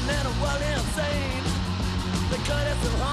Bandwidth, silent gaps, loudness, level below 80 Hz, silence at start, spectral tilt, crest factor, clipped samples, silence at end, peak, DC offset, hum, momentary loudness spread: 14.5 kHz; none; -27 LUFS; -32 dBFS; 0 s; -5 dB/octave; 12 dB; under 0.1%; 0 s; -12 dBFS; under 0.1%; none; 2 LU